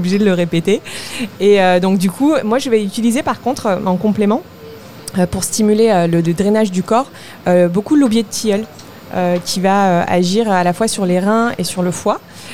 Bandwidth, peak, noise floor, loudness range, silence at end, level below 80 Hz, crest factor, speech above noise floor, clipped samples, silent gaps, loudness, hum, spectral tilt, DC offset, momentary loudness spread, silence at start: 16 kHz; -2 dBFS; -34 dBFS; 2 LU; 0 s; -48 dBFS; 14 dB; 20 dB; under 0.1%; none; -15 LUFS; none; -5.5 dB/octave; 1%; 10 LU; 0 s